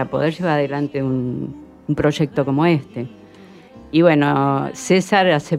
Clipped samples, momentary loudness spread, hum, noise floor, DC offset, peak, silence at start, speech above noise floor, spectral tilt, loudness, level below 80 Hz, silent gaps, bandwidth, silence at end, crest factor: under 0.1%; 15 LU; none; -43 dBFS; under 0.1%; 0 dBFS; 0 s; 25 dB; -6.5 dB/octave; -18 LUFS; -50 dBFS; none; 13.5 kHz; 0 s; 18 dB